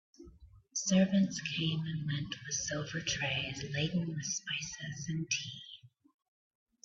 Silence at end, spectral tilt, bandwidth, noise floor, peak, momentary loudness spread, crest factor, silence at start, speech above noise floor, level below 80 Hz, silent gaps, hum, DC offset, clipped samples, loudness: 1 s; -4 dB/octave; 7.8 kHz; -58 dBFS; -18 dBFS; 11 LU; 18 dB; 0.2 s; 23 dB; -64 dBFS; none; none; under 0.1%; under 0.1%; -34 LUFS